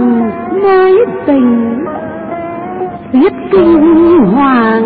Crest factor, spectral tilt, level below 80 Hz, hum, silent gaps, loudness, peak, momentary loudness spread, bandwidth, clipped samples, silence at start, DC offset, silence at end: 8 dB; -13 dB/octave; -40 dBFS; none; none; -9 LUFS; 0 dBFS; 14 LU; 4.8 kHz; under 0.1%; 0 s; under 0.1%; 0 s